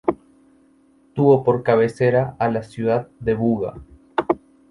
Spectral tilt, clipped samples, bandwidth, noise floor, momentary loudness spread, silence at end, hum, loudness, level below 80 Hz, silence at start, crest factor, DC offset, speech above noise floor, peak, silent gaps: -8.5 dB/octave; under 0.1%; 11 kHz; -56 dBFS; 10 LU; 0.35 s; none; -20 LUFS; -50 dBFS; 0.05 s; 18 dB; under 0.1%; 37 dB; -2 dBFS; none